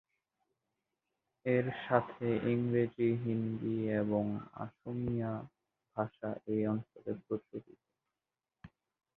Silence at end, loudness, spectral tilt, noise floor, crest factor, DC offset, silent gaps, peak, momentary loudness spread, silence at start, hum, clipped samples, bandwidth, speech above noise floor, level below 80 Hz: 0.5 s; -36 LUFS; -7.5 dB/octave; under -90 dBFS; 24 dB; under 0.1%; none; -12 dBFS; 12 LU; 1.45 s; none; under 0.1%; 4.2 kHz; over 55 dB; -68 dBFS